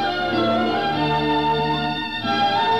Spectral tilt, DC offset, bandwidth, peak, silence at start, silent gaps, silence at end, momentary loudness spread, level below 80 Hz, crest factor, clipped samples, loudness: -6 dB/octave; 0.6%; 14.5 kHz; -10 dBFS; 0 s; none; 0 s; 3 LU; -48 dBFS; 10 dB; under 0.1%; -21 LUFS